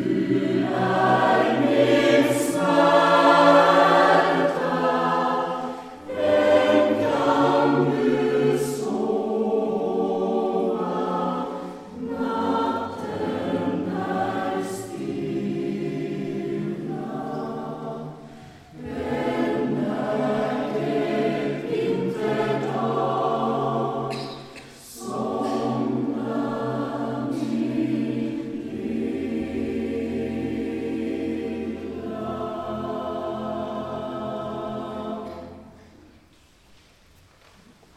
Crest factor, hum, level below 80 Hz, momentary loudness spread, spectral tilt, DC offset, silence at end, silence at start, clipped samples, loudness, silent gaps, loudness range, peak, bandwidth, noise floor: 22 dB; none; -58 dBFS; 14 LU; -6 dB/octave; under 0.1%; 2.2 s; 0 s; under 0.1%; -23 LUFS; none; 12 LU; -2 dBFS; 15 kHz; -55 dBFS